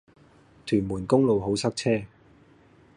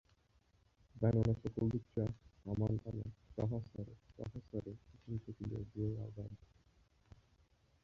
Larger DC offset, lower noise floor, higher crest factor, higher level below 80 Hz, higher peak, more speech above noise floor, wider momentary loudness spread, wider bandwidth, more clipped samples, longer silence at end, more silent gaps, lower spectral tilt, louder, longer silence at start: neither; second, -56 dBFS vs -73 dBFS; about the same, 20 dB vs 22 dB; about the same, -54 dBFS vs -58 dBFS; first, -8 dBFS vs -20 dBFS; about the same, 32 dB vs 34 dB; second, 11 LU vs 16 LU; first, 11.5 kHz vs 6.8 kHz; neither; second, 0.9 s vs 1.45 s; neither; second, -6 dB/octave vs -10.5 dB/octave; first, -25 LUFS vs -41 LUFS; second, 0.65 s vs 0.95 s